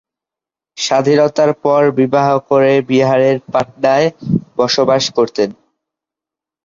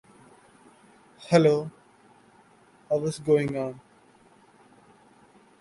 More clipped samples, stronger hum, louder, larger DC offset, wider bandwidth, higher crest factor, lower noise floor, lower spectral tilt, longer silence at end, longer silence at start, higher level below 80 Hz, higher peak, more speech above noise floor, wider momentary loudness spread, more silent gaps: neither; neither; first, -13 LUFS vs -25 LUFS; neither; second, 7.6 kHz vs 11.5 kHz; second, 14 dB vs 22 dB; first, -87 dBFS vs -58 dBFS; second, -5 dB/octave vs -6.5 dB/octave; second, 1.15 s vs 1.85 s; second, 0.75 s vs 1.2 s; first, -56 dBFS vs -66 dBFS; first, -2 dBFS vs -6 dBFS; first, 75 dB vs 35 dB; second, 7 LU vs 21 LU; neither